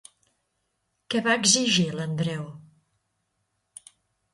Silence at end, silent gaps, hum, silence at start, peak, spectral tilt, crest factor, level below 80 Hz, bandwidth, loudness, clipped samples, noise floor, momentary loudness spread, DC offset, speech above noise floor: 1.75 s; none; none; 1.1 s; -6 dBFS; -3 dB/octave; 24 dB; -66 dBFS; 11.5 kHz; -23 LUFS; under 0.1%; -76 dBFS; 13 LU; under 0.1%; 52 dB